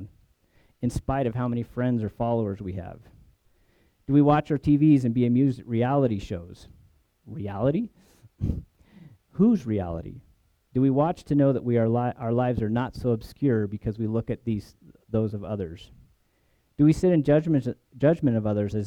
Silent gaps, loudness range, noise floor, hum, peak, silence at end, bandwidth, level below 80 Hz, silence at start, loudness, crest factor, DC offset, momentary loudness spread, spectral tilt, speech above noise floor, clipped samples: none; 6 LU; -67 dBFS; none; -8 dBFS; 0 s; 10.5 kHz; -48 dBFS; 0 s; -25 LUFS; 18 dB; under 0.1%; 16 LU; -9 dB/octave; 43 dB; under 0.1%